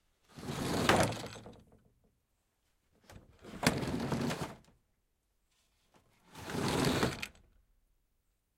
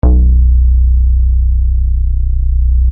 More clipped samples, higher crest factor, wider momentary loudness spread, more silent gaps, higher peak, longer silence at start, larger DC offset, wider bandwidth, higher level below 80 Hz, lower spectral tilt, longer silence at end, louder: neither; first, 28 dB vs 8 dB; first, 20 LU vs 5 LU; neither; second, -10 dBFS vs 0 dBFS; first, 0.35 s vs 0.05 s; neither; first, 16.5 kHz vs 1.3 kHz; second, -58 dBFS vs -8 dBFS; second, -4.5 dB/octave vs -15.5 dB/octave; first, 1.25 s vs 0 s; second, -34 LUFS vs -13 LUFS